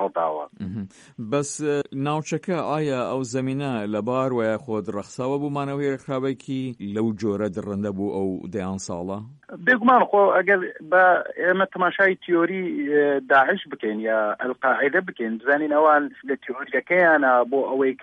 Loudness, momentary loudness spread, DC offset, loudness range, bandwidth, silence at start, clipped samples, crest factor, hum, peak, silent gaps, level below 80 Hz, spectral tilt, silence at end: -22 LUFS; 12 LU; under 0.1%; 7 LU; 11 kHz; 0 s; under 0.1%; 16 dB; none; -6 dBFS; none; -66 dBFS; -5.5 dB/octave; 0 s